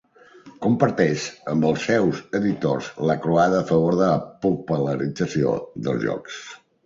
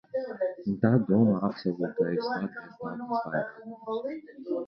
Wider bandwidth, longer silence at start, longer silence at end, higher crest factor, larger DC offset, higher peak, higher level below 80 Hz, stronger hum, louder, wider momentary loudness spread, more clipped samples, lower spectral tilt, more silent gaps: first, 7.8 kHz vs 5.8 kHz; first, 0.45 s vs 0.15 s; first, 0.3 s vs 0 s; about the same, 18 dB vs 20 dB; neither; first, -4 dBFS vs -10 dBFS; first, -56 dBFS vs -66 dBFS; neither; first, -22 LUFS vs -29 LUFS; second, 8 LU vs 15 LU; neither; second, -6.5 dB/octave vs -10 dB/octave; neither